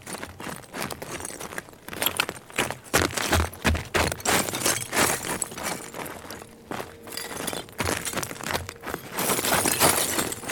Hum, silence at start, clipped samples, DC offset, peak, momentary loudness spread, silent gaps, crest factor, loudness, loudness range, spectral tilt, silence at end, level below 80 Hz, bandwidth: none; 0 s; under 0.1%; under 0.1%; -4 dBFS; 14 LU; none; 22 dB; -26 LUFS; 7 LU; -2.5 dB/octave; 0 s; -46 dBFS; over 20 kHz